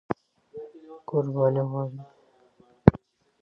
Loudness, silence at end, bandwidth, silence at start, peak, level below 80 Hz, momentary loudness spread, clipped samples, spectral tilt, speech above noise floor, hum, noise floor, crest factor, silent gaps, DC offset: -25 LUFS; 0.45 s; 5.6 kHz; 0.1 s; 0 dBFS; -44 dBFS; 23 LU; under 0.1%; -11 dB/octave; 34 dB; none; -60 dBFS; 26 dB; none; under 0.1%